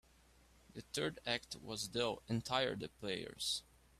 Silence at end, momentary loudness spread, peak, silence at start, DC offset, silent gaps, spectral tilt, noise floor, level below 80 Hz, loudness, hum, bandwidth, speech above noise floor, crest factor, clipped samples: 0.4 s; 8 LU; -18 dBFS; 0.7 s; under 0.1%; none; -3.5 dB/octave; -68 dBFS; -68 dBFS; -40 LUFS; none; 15.5 kHz; 26 dB; 24 dB; under 0.1%